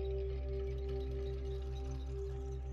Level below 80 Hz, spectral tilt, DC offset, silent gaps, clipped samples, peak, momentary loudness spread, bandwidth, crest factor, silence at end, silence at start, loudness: -42 dBFS; -8 dB/octave; under 0.1%; none; under 0.1%; -30 dBFS; 3 LU; 6.8 kHz; 10 dB; 0 s; 0 s; -42 LUFS